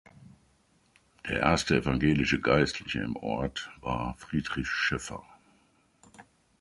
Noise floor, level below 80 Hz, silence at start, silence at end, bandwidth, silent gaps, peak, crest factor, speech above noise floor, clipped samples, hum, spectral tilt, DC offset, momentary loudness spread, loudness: -67 dBFS; -48 dBFS; 0.2 s; 0.4 s; 11.5 kHz; none; -8 dBFS; 24 dB; 38 dB; under 0.1%; none; -5 dB/octave; under 0.1%; 11 LU; -29 LUFS